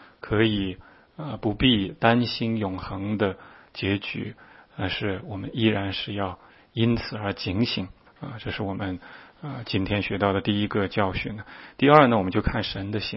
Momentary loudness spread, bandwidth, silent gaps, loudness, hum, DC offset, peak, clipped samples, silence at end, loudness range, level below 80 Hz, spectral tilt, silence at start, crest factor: 17 LU; 5.8 kHz; none; -25 LUFS; none; under 0.1%; 0 dBFS; under 0.1%; 0 s; 6 LU; -46 dBFS; -9.5 dB/octave; 0 s; 26 dB